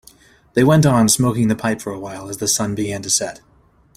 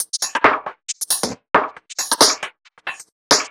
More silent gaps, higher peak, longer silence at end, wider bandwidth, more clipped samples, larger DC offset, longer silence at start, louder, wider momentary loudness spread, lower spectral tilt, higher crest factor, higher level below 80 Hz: second, none vs 3.12-3.30 s; about the same, -2 dBFS vs 0 dBFS; first, 0.6 s vs 0 s; second, 16 kHz vs over 20 kHz; neither; neither; first, 0.55 s vs 0 s; about the same, -17 LUFS vs -18 LUFS; about the same, 15 LU vs 17 LU; first, -4.5 dB/octave vs -0.5 dB/octave; about the same, 16 dB vs 20 dB; first, -48 dBFS vs -58 dBFS